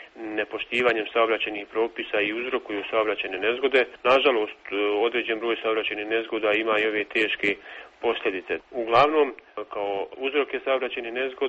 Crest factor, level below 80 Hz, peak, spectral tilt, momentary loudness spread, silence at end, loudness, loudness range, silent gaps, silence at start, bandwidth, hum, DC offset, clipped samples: 18 dB; -64 dBFS; -6 dBFS; -0.5 dB/octave; 9 LU; 0 s; -25 LUFS; 2 LU; none; 0 s; 8 kHz; none; under 0.1%; under 0.1%